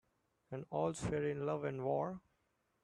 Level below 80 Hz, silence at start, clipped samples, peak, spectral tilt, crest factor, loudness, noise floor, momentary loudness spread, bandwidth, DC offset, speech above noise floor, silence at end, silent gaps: -66 dBFS; 0.5 s; under 0.1%; -24 dBFS; -6.5 dB/octave; 18 dB; -40 LUFS; -81 dBFS; 11 LU; 11.5 kHz; under 0.1%; 42 dB; 0.65 s; none